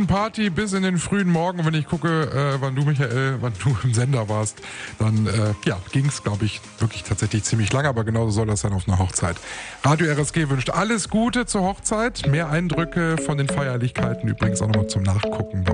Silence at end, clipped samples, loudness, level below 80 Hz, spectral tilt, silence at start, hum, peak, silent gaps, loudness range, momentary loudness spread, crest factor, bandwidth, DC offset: 0 s; under 0.1%; -22 LUFS; -44 dBFS; -5.5 dB/octave; 0 s; none; -6 dBFS; none; 1 LU; 4 LU; 16 dB; 10 kHz; under 0.1%